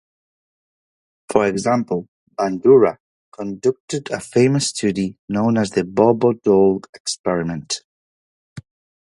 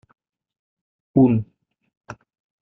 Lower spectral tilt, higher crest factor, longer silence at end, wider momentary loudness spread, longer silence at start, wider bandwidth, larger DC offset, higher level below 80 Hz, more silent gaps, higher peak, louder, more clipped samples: second, -5.5 dB/octave vs -11 dB/octave; about the same, 20 dB vs 20 dB; about the same, 0.45 s vs 0.5 s; second, 12 LU vs 25 LU; first, 1.3 s vs 1.15 s; first, 11.5 kHz vs 6 kHz; neither; about the same, -56 dBFS vs -58 dBFS; first, 2.08-2.27 s, 3.00-3.32 s, 3.80-3.88 s, 5.19-5.28 s, 6.89-6.93 s, 7.00-7.05 s, 7.19-7.24 s, 7.84-8.56 s vs 1.97-2.01 s; first, 0 dBFS vs -4 dBFS; about the same, -19 LUFS vs -19 LUFS; neither